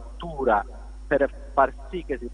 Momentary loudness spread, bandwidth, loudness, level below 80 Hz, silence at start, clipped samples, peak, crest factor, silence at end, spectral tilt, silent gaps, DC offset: 13 LU; 10 kHz; -25 LUFS; -38 dBFS; 0 s; under 0.1%; -6 dBFS; 20 dB; 0 s; -7 dB/octave; none; under 0.1%